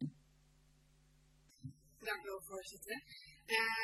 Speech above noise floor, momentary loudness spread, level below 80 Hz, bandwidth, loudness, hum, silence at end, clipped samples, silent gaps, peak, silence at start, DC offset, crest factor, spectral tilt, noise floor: 28 dB; 20 LU; -74 dBFS; 13.5 kHz; -42 LUFS; none; 0 s; under 0.1%; none; -18 dBFS; 0 s; under 0.1%; 26 dB; -3 dB/octave; -70 dBFS